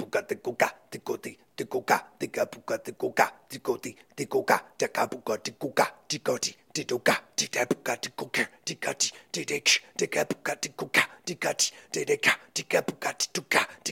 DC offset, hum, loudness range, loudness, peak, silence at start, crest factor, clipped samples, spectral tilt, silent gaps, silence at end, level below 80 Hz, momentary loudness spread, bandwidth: under 0.1%; none; 3 LU; -28 LUFS; -6 dBFS; 0 s; 24 dB; under 0.1%; -2 dB/octave; none; 0 s; -76 dBFS; 10 LU; 16.5 kHz